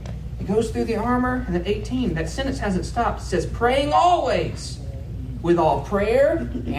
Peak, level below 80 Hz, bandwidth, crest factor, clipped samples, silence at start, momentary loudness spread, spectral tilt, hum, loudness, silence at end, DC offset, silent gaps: -6 dBFS; -34 dBFS; 15 kHz; 16 dB; under 0.1%; 0 s; 13 LU; -6 dB/octave; none; -22 LUFS; 0 s; under 0.1%; none